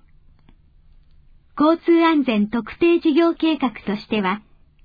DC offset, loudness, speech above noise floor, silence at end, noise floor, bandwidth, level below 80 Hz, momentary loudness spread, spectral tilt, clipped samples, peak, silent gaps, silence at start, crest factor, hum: under 0.1%; -19 LUFS; 33 dB; 0.45 s; -51 dBFS; 5 kHz; -52 dBFS; 9 LU; -8 dB/octave; under 0.1%; -6 dBFS; none; 1.55 s; 14 dB; none